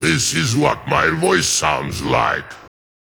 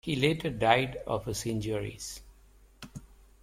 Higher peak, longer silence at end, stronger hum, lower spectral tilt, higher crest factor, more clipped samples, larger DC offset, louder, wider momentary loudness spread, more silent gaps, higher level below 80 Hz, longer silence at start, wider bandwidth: first, -2 dBFS vs -8 dBFS; about the same, 0.45 s vs 0.35 s; neither; second, -3.5 dB/octave vs -5 dB/octave; second, 18 dB vs 24 dB; neither; first, 0.1% vs under 0.1%; first, -17 LUFS vs -30 LUFS; second, 6 LU vs 22 LU; neither; first, -42 dBFS vs -52 dBFS; about the same, 0 s vs 0.05 s; first, over 20 kHz vs 16.5 kHz